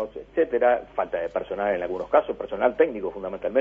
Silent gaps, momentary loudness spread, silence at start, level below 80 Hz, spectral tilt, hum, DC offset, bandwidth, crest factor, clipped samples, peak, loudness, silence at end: none; 9 LU; 0 s; -54 dBFS; -7.5 dB/octave; 50 Hz at -55 dBFS; under 0.1%; 3.7 kHz; 18 dB; under 0.1%; -6 dBFS; -25 LUFS; 0 s